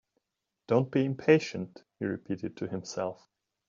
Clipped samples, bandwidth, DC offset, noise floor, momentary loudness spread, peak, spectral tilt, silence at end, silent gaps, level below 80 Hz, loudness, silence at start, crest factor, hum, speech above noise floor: under 0.1%; 7.6 kHz; under 0.1%; -86 dBFS; 12 LU; -8 dBFS; -6 dB/octave; 0.55 s; none; -72 dBFS; -30 LUFS; 0.7 s; 24 dB; none; 56 dB